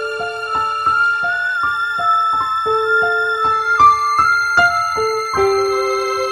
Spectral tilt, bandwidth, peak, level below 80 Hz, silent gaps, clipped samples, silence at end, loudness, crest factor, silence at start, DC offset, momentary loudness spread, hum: -3 dB/octave; 15 kHz; -2 dBFS; -48 dBFS; none; under 0.1%; 0 s; -15 LUFS; 14 dB; 0 s; under 0.1%; 7 LU; none